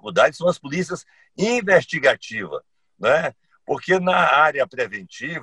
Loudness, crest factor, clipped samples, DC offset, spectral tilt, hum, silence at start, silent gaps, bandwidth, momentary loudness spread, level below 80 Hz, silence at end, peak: -20 LUFS; 18 dB; under 0.1%; under 0.1%; -4.5 dB/octave; none; 0.05 s; none; 11 kHz; 13 LU; -60 dBFS; 0 s; -2 dBFS